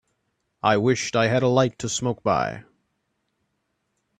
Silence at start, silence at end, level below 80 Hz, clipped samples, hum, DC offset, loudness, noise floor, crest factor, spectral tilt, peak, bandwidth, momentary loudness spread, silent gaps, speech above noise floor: 0.65 s; 1.6 s; -58 dBFS; under 0.1%; none; under 0.1%; -22 LUFS; -75 dBFS; 20 dB; -5 dB/octave; -6 dBFS; 9.8 kHz; 6 LU; none; 53 dB